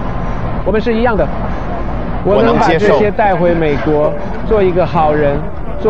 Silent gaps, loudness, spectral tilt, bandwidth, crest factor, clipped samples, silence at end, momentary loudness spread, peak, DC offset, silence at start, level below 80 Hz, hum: none; -13 LUFS; -8 dB/octave; 8 kHz; 14 dB; under 0.1%; 0 s; 10 LU; 0 dBFS; 9%; 0 s; -24 dBFS; none